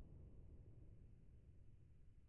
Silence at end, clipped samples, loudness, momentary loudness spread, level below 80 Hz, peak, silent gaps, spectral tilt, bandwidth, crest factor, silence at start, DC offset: 0 s; under 0.1%; -66 LUFS; 5 LU; -66 dBFS; -48 dBFS; none; -11 dB/octave; 3 kHz; 14 dB; 0 s; under 0.1%